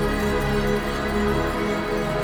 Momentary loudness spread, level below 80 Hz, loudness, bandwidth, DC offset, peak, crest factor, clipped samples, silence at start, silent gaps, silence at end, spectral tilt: 2 LU; -32 dBFS; -23 LUFS; 19.5 kHz; under 0.1%; -10 dBFS; 12 dB; under 0.1%; 0 s; none; 0 s; -6 dB/octave